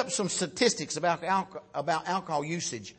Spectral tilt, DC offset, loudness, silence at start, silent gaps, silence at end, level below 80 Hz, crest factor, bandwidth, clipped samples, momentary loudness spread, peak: -3 dB/octave; under 0.1%; -29 LUFS; 0 s; none; 0.05 s; -70 dBFS; 20 dB; 8.8 kHz; under 0.1%; 6 LU; -10 dBFS